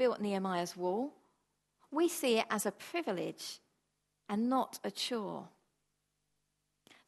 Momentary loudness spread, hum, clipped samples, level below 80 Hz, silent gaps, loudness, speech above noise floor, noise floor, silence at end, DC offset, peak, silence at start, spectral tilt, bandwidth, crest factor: 12 LU; 50 Hz at -65 dBFS; under 0.1%; -86 dBFS; none; -36 LUFS; 48 dB; -83 dBFS; 1.6 s; under 0.1%; -16 dBFS; 0 s; -4 dB/octave; 12.5 kHz; 20 dB